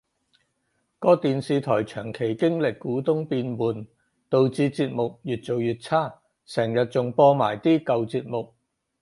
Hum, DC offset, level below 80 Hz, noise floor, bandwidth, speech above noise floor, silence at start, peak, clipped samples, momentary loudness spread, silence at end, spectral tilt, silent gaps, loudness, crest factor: none; under 0.1%; -64 dBFS; -73 dBFS; 11.5 kHz; 50 dB; 1 s; -4 dBFS; under 0.1%; 11 LU; 0.55 s; -7.5 dB/octave; none; -24 LUFS; 20 dB